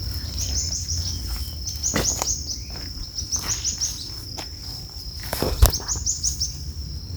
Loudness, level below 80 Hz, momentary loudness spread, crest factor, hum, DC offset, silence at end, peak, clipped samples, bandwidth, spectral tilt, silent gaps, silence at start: -25 LUFS; -30 dBFS; 12 LU; 26 dB; none; under 0.1%; 0 s; 0 dBFS; under 0.1%; over 20 kHz; -2.5 dB/octave; none; 0 s